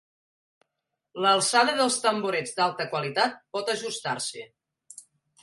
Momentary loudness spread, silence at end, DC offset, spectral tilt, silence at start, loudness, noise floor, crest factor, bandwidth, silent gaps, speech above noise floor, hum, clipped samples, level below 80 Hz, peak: 11 LU; 0.4 s; under 0.1%; -2 dB/octave; 1.15 s; -25 LUFS; -83 dBFS; 20 dB; 12 kHz; none; 57 dB; none; under 0.1%; -78 dBFS; -8 dBFS